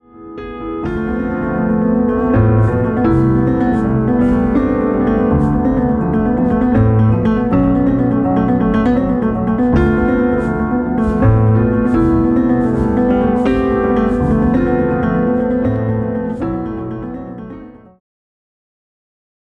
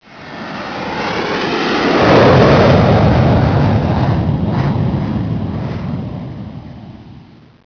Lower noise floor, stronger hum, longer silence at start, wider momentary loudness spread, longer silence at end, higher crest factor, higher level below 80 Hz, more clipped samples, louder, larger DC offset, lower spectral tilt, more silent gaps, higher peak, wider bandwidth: second, -34 dBFS vs -39 dBFS; neither; about the same, 0.15 s vs 0.1 s; second, 8 LU vs 20 LU; first, 1.7 s vs 0.5 s; about the same, 14 dB vs 14 dB; about the same, -28 dBFS vs -30 dBFS; neither; about the same, -14 LUFS vs -13 LUFS; neither; first, -10.5 dB/octave vs -7.5 dB/octave; neither; about the same, 0 dBFS vs 0 dBFS; second, 4.5 kHz vs 5.4 kHz